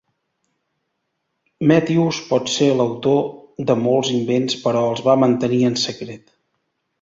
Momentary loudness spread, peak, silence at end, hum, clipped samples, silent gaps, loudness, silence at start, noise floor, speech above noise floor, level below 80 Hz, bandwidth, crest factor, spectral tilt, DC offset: 7 LU; -2 dBFS; 0.85 s; none; under 0.1%; none; -18 LUFS; 1.6 s; -74 dBFS; 56 dB; -60 dBFS; 7.8 kHz; 18 dB; -5.5 dB/octave; under 0.1%